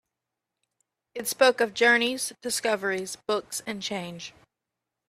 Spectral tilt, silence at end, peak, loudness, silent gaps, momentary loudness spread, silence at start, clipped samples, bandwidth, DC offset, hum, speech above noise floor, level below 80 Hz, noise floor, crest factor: -2 dB/octave; 0.8 s; -8 dBFS; -25 LUFS; none; 16 LU; 1.15 s; under 0.1%; 15.5 kHz; under 0.1%; none; 60 dB; -72 dBFS; -86 dBFS; 22 dB